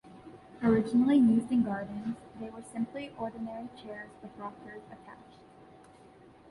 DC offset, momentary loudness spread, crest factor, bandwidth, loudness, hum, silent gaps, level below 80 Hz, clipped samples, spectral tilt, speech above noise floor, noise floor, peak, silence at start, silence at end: under 0.1%; 25 LU; 18 dB; 11 kHz; -30 LUFS; none; none; -64 dBFS; under 0.1%; -7.5 dB/octave; 25 dB; -56 dBFS; -14 dBFS; 0.05 s; 1.35 s